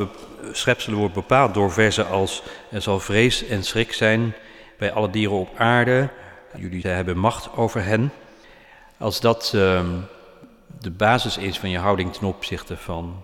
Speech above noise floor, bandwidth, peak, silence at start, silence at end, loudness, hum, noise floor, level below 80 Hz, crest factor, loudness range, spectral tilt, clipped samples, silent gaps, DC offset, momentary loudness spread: 27 dB; 17 kHz; -4 dBFS; 0 s; 0 s; -21 LUFS; none; -48 dBFS; -46 dBFS; 18 dB; 4 LU; -5 dB/octave; under 0.1%; none; under 0.1%; 13 LU